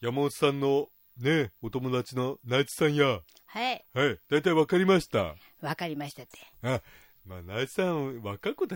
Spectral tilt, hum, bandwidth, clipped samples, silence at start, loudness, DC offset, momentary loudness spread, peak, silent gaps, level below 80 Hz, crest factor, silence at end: -5.5 dB/octave; none; 16.5 kHz; under 0.1%; 0 s; -29 LUFS; under 0.1%; 13 LU; -10 dBFS; none; -62 dBFS; 18 dB; 0 s